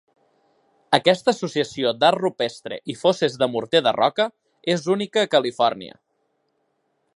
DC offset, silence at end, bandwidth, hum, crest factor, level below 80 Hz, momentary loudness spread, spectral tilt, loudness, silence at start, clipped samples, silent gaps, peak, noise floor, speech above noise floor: under 0.1%; 1.25 s; 11.5 kHz; none; 22 dB; -70 dBFS; 9 LU; -4.5 dB/octave; -21 LUFS; 0.9 s; under 0.1%; none; 0 dBFS; -71 dBFS; 50 dB